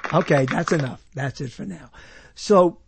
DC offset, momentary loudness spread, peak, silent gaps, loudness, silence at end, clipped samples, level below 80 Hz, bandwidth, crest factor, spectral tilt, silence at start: under 0.1%; 18 LU; -4 dBFS; none; -22 LUFS; 0.15 s; under 0.1%; -54 dBFS; 8.8 kHz; 18 dB; -6.5 dB/octave; 0.05 s